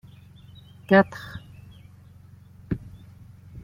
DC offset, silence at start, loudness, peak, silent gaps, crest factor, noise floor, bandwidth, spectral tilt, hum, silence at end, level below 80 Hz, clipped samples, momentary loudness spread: under 0.1%; 0.9 s; -23 LUFS; -4 dBFS; none; 24 dB; -49 dBFS; 14.5 kHz; -8 dB/octave; none; 0.05 s; -52 dBFS; under 0.1%; 28 LU